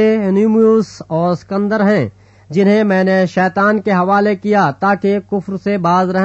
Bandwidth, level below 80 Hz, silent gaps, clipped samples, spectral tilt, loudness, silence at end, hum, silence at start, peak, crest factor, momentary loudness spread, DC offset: 8 kHz; -54 dBFS; none; under 0.1%; -7.5 dB/octave; -14 LUFS; 0 s; none; 0 s; -2 dBFS; 12 dB; 7 LU; under 0.1%